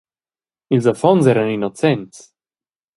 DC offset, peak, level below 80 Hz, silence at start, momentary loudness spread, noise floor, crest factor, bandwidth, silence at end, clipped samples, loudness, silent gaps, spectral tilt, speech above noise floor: under 0.1%; 0 dBFS; -60 dBFS; 0.7 s; 7 LU; under -90 dBFS; 18 dB; 11.5 kHz; 0.9 s; under 0.1%; -16 LUFS; none; -7 dB/octave; over 74 dB